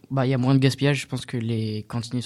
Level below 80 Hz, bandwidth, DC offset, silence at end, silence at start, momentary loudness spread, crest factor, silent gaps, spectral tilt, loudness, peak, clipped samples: -58 dBFS; 12.5 kHz; under 0.1%; 0 s; 0.1 s; 10 LU; 18 dB; none; -6.5 dB/octave; -24 LUFS; -6 dBFS; under 0.1%